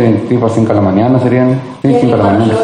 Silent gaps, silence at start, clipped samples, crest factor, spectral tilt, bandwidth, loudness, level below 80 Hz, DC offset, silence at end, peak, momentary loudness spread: none; 0 s; under 0.1%; 10 dB; -8.5 dB/octave; 10 kHz; -10 LUFS; -44 dBFS; under 0.1%; 0 s; 0 dBFS; 3 LU